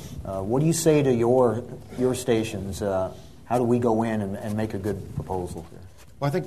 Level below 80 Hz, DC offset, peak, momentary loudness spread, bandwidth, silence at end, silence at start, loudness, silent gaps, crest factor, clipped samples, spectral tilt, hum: -48 dBFS; 0.3%; -6 dBFS; 13 LU; 13.5 kHz; 0 s; 0 s; -25 LUFS; none; 18 dB; under 0.1%; -6.5 dB/octave; none